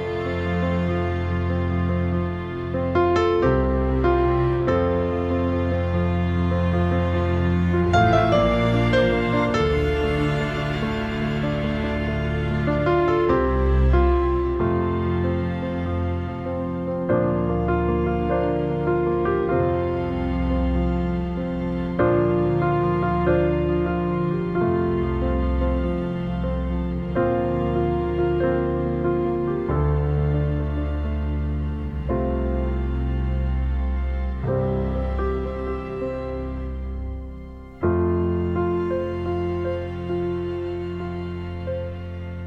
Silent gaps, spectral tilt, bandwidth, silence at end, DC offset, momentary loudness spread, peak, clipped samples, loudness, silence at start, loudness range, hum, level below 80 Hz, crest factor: none; -8.5 dB/octave; 7.4 kHz; 0 s; under 0.1%; 8 LU; -4 dBFS; under 0.1%; -23 LUFS; 0 s; 5 LU; none; -30 dBFS; 18 dB